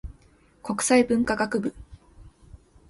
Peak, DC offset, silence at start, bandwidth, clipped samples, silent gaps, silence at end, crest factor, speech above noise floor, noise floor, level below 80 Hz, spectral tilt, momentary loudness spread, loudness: -6 dBFS; under 0.1%; 0.05 s; 12 kHz; under 0.1%; none; 0.35 s; 20 dB; 34 dB; -57 dBFS; -48 dBFS; -4 dB/octave; 18 LU; -24 LUFS